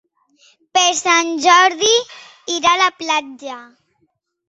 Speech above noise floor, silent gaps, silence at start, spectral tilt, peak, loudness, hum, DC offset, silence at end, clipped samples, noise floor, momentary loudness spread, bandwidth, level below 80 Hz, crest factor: 50 dB; none; 0.75 s; 0.5 dB/octave; 0 dBFS; -14 LUFS; none; under 0.1%; 0.85 s; under 0.1%; -66 dBFS; 21 LU; 8.2 kHz; -64 dBFS; 18 dB